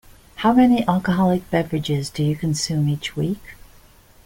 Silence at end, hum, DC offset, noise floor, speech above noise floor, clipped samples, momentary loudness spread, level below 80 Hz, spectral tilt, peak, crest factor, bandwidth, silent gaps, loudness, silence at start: 0.7 s; none; under 0.1%; -49 dBFS; 30 dB; under 0.1%; 9 LU; -46 dBFS; -6 dB/octave; -4 dBFS; 16 dB; 17 kHz; none; -20 LUFS; 0.35 s